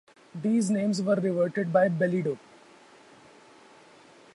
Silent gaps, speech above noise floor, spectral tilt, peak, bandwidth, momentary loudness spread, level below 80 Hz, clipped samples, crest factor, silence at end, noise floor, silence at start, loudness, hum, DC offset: none; 29 dB; -6.5 dB/octave; -10 dBFS; 11.5 kHz; 9 LU; -74 dBFS; under 0.1%; 18 dB; 2 s; -54 dBFS; 0.35 s; -26 LUFS; none; under 0.1%